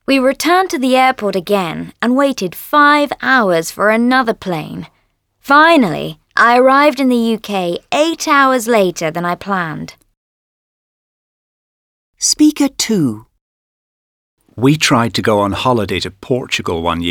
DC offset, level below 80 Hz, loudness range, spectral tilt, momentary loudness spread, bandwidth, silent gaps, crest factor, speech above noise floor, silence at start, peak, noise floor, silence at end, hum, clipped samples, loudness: under 0.1%; -48 dBFS; 6 LU; -4 dB/octave; 11 LU; 19.5 kHz; 10.17-12.13 s, 13.41-14.37 s; 14 dB; 48 dB; 0.1 s; 0 dBFS; -61 dBFS; 0 s; none; under 0.1%; -13 LUFS